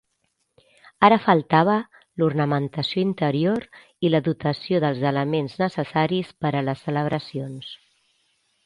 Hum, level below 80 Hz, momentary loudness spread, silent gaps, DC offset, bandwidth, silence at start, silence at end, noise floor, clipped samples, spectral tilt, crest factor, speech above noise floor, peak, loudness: none; -62 dBFS; 10 LU; none; under 0.1%; 10.5 kHz; 1 s; 0.9 s; -72 dBFS; under 0.1%; -8 dB/octave; 22 dB; 51 dB; 0 dBFS; -22 LUFS